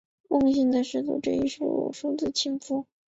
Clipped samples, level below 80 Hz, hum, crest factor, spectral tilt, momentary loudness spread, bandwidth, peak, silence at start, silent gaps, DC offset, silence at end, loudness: under 0.1%; -60 dBFS; none; 16 dB; -4.5 dB/octave; 7 LU; 8 kHz; -10 dBFS; 0.3 s; none; under 0.1%; 0.25 s; -27 LUFS